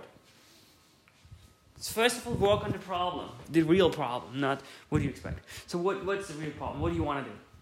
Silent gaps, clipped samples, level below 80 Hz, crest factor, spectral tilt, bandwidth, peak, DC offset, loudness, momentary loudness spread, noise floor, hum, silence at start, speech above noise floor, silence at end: none; under 0.1%; -54 dBFS; 20 dB; -5.5 dB/octave; 16 kHz; -12 dBFS; under 0.1%; -31 LUFS; 14 LU; -62 dBFS; none; 0 s; 32 dB; 0.2 s